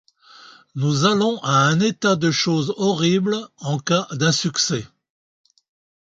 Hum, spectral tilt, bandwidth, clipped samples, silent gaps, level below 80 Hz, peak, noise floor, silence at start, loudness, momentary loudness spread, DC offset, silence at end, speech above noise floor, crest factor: none; -4.5 dB/octave; 9.2 kHz; under 0.1%; none; -60 dBFS; -4 dBFS; -47 dBFS; 0.75 s; -19 LUFS; 8 LU; under 0.1%; 1.15 s; 28 dB; 18 dB